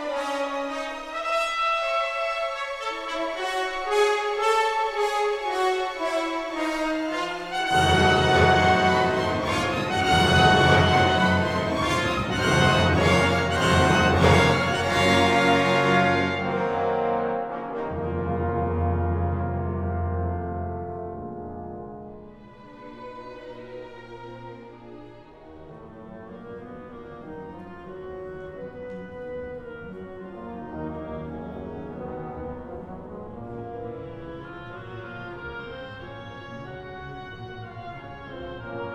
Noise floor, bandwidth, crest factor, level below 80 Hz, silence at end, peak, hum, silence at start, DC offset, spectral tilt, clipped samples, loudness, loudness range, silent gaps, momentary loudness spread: -45 dBFS; 15 kHz; 20 dB; -44 dBFS; 0 s; -6 dBFS; none; 0 s; under 0.1%; -5 dB/octave; under 0.1%; -23 LUFS; 21 LU; none; 21 LU